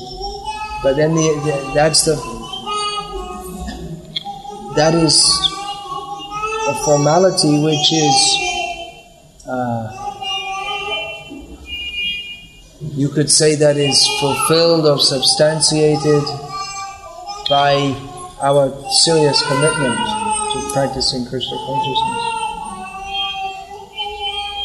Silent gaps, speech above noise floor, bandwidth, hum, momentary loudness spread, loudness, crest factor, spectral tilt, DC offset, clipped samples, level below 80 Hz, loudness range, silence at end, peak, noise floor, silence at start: none; 28 dB; 13 kHz; none; 17 LU; -16 LUFS; 18 dB; -3.5 dB/octave; under 0.1%; under 0.1%; -42 dBFS; 9 LU; 0 s; 0 dBFS; -42 dBFS; 0 s